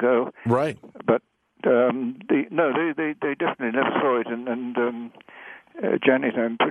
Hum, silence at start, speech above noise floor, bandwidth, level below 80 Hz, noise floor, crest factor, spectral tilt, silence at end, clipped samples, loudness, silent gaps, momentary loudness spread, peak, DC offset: none; 0 s; 22 dB; 10.5 kHz; -70 dBFS; -45 dBFS; 20 dB; -7.5 dB/octave; 0 s; under 0.1%; -24 LUFS; none; 10 LU; -4 dBFS; under 0.1%